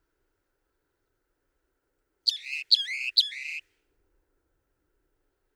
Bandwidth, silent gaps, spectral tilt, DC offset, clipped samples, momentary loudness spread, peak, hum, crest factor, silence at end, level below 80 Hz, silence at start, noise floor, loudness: over 20 kHz; none; 5 dB/octave; under 0.1%; under 0.1%; 13 LU; -6 dBFS; none; 28 dB; 1.95 s; -78 dBFS; 2.25 s; -78 dBFS; -25 LUFS